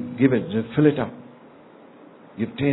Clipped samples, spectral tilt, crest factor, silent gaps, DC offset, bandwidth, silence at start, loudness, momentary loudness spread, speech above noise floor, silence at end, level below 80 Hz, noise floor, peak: under 0.1%; -11.5 dB/octave; 20 dB; none; under 0.1%; 4.1 kHz; 0 s; -22 LUFS; 18 LU; 27 dB; 0 s; -58 dBFS; -48 dBFS; -4 dBFS